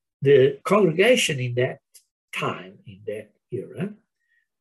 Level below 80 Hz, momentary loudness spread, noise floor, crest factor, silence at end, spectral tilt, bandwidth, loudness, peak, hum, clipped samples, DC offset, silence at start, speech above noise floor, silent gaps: -70 dBFS; 19 LU; -71 dBFS; 16 dB; 0.7 s; -5 dB/octave; 12.5 kHz; -21 LUFS; -6 dBFS; none; under 0.1%; under 0.1%; 0.2 s; 49 dB; 2.11-2.28 s